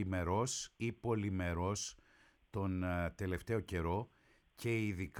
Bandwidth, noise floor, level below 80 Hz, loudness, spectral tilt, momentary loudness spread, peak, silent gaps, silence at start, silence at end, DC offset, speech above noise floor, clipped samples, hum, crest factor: 17 kHz; -69 dBFS; -56 dBFS; -39 LUFS; -5.5 dB/octave; 6 LU; -24 dBFS; none; 0 s; 0 s; under 0.1%; 31 dB; under 0.1%; none; 14 dB